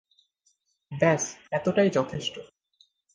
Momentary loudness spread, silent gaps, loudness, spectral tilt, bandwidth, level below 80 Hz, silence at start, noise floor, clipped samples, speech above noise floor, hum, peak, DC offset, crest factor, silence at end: 13 LU; none; -26 LUFS; -4.5 dB/octave; 10.5 kHz; -64 dBFS; 0.9 s; -71 dBFS; under 0.1%; 46 dB; none; -8 dBFS; under 0.1%; 20 dB; 0.7 s